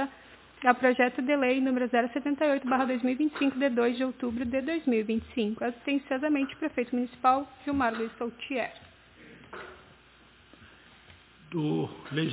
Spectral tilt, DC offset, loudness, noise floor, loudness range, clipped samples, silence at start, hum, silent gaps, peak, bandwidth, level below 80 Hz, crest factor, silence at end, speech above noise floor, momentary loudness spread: -4 dB/octave; under 0.1%; -29 LUFS; -58 dBFS; 12 LU; under 0.1%; 0 s; none; none; -6 dBFS; 4 kHz; -60 dBFS; 22 dB; 0 s; 29 dB; 9 LU